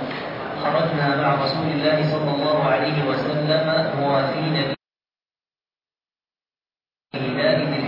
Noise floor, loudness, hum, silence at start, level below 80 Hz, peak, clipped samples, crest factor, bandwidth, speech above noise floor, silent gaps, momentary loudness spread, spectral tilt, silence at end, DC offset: under -90 dBFS; -21 LUFS; none; 0 s; -62 dBFS; -6 dBFS; under 0.1%; 16 dB; 5.8 kHz; over 70 dB; none; 8 LU; -8.5 dB/octave; 0 s; under 0.1%